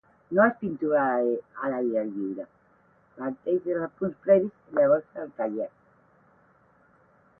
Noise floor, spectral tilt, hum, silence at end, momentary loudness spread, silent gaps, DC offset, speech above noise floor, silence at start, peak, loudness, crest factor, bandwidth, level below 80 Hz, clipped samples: -62 dBFS; -11.5 dB/octave; none; 1.7 s; 13 LU; none; under 0.1%; 36 dB; 0.3 s; -8 dBFS; -27 LUFS; 20 dB; 3.3 kHz; -70 dBFS; under 0.1%